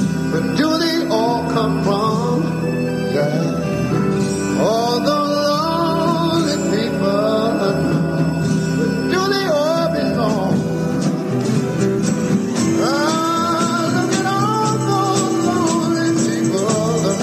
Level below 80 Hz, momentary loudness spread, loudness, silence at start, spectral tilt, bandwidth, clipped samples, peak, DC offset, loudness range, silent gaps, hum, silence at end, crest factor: -46 dBFS; 2 LU; -17 LUFS; 0 s; -5.5 dB/octave; 15.5 kHz; under 0.1%; -4 dBFS; under 0.1%; 1 LU; none; none; 0 s; 14 dB